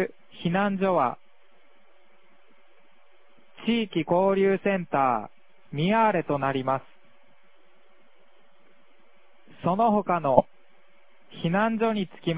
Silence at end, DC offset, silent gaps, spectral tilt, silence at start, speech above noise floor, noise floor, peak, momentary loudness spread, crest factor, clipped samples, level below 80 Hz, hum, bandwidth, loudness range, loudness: 0 s; 0.4%; none; -10.5 dB/octave; 0 s; 39 dB; -63 dBFS; -2 dBFS; 10 LU; 26 dB; under 0.1%; -62 dBFS; none; 4 kHz; 8 LU; -25 LUFS